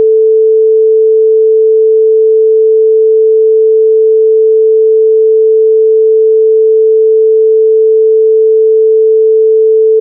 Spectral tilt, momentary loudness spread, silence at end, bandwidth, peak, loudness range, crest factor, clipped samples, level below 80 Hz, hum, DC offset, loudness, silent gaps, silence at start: 1 dB/octave; 0 LU; 0 s; 0.5 kHz; -2 dBFS; 0 LU; 4 dB; under 0.1%; under -90 dBFS; none; under 0.1%; -7 LUFS; none; 0 s